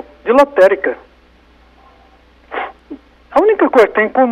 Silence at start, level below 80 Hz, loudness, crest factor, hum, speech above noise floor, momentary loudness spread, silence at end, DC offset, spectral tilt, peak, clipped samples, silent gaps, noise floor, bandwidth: 0.25 s; -50 dBFS; -13 LUFS; 14 dB; 60 Hz at -50 dBFS; 37 dB; 16 LU; 0 s; under 0.1%; -5.5 dB/octave; -2 dBFS; under 0.1%; none; -48 dBFS; 12 kHz